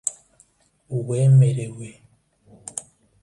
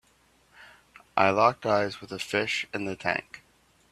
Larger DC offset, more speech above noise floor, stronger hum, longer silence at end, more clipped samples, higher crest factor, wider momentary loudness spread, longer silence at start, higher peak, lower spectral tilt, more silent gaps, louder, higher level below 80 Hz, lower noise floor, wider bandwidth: neither; first, 41 dB vs 37 dB; neither; about the same, 0.45 s vs 0.55 s; neither; second, 18 dB vs 24 dB; first, 24 LU vs 11 LU; second, 0.05 s vs 0.6 s; about the same, -6 dBFS vs -4 dBFS; first, -7 dB/octave vs -4.5 dB/octave; neither; first, -20 LUFS vs -27 LUFS; first, -60 dBFS vs -66 dBFS; second, -59 dBFS vs -64 dBFS; second, 11.5 kHz vs 14.5 kHz